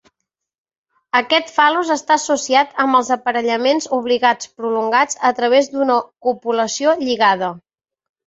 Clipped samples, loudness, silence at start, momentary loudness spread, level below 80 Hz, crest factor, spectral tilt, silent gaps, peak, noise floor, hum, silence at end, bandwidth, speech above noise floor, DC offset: under 0.1%; -17 LUFS; 1.15 s; 5 LU; -66 dBFS; 16 dB; -2 dB/octave; none; 0 dBFS; -79 dBFS; none; 0.7 s; 8 kHz; 62 dB; under 0.1%